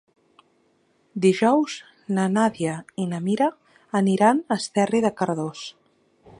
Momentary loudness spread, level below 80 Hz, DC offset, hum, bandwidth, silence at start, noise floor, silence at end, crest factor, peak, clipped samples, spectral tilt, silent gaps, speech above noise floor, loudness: 12 LU; -68 dBFS; under 0.1%; none; 11 kHz; 1.15 s; -64 dBFS; 0.7 s; 20 dB; -4 dBFS; under 0.1%; -6 dB/octave; none; 43 dB; -23 LUFS